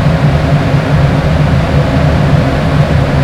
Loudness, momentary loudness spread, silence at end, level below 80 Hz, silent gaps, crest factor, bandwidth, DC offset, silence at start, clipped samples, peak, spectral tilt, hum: -10 LUFS; 1 LU; 0 s; -18 dBFS; none; 8 dB; 11 kHz; under 0.1%; 0 s; 0.5%; 0 dBFS; -7.5 dB/octave; none